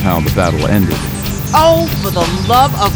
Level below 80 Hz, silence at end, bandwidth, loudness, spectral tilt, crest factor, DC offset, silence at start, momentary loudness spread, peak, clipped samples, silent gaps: -26 dBFS; 0 s; over 20 kHz; -13 LUFS; -5.5 dB/octave; 12 dB; under 0.1%; 0 s; 7 LU; 0 dBFS; under 0.1%; none